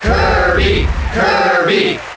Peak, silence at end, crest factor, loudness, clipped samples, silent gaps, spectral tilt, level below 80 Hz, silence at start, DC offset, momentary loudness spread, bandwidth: -2 dBFS; 0 s; 10 dB; -13 LUFS; under 0.1%; none; -5.5 dB/octave; -20 dBFS; 0 s; under 0.1%; 4 LU; 8 kHz